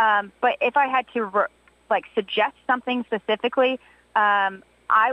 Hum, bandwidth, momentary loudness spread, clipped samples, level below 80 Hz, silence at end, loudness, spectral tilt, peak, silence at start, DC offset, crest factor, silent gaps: none; 9.6 kHz; 6 LU; under 0.1%; -68 dBFS; 0 s; -23 LUFS; -5.5 dB/octave; -6 dBFS; 0 s; under 0.1%; 16 dB; none